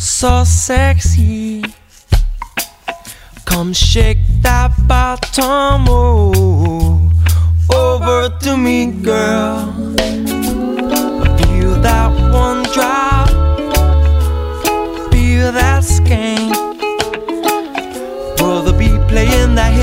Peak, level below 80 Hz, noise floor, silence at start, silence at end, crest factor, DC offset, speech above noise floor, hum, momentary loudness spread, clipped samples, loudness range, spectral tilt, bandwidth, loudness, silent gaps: 0 dBFS; -16 dBFS; -34 dBFS; 0 s; 0 s; 12 dB; under 0.1%; 23 dB; none; 8 LU; under 0.1%; 3 LU; -5 dB/octave; 16.5 kHz; -13 LUFS; none